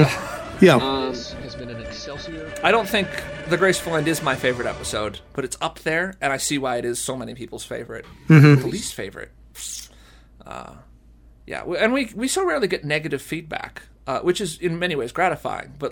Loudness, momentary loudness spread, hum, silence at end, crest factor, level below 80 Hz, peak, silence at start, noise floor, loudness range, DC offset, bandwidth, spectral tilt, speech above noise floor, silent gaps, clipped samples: -21 LUFS; 18 LU; none; 0 s; 20 dB; -48 dBFS; -2 dBFS; 0 s; -49 dBFS; 6 LU; under 0.1%; 18 kHz; -5 dB/octave; 28 dB; none; under 0.1%